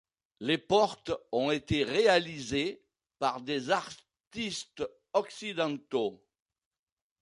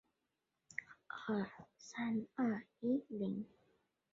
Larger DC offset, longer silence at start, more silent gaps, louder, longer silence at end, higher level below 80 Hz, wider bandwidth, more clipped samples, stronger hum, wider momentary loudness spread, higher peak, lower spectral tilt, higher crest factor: neither; second, 0.4 s vs 0.7 s; first, 4.27-4.31 s vs none; first, -31 LUFS vs -42 LUFS; first, 1.05 s vs 0.65 s; first, -60 dBFS vs -82 dBFS; first, 11.5 kHz vs 7.4 kHz; neither; neither; about the same, 12 LU vs 12 LU; first, -10 dBFS vs -24 dBFS; second, -4.5 dB/octave vs -6 dB/octave; about the same, 22 dB vs 18 dB